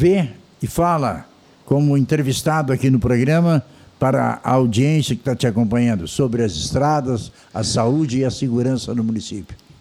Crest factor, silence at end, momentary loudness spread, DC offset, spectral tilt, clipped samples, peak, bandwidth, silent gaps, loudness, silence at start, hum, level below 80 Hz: 14 dB; 0.25 s; 8 LU; under 0.1%; -6.5 dB/octave; under 0.1%; -4 dBFS; 15.5 kHz; none; -19 LUFS; 0 s; none; -44 dBFS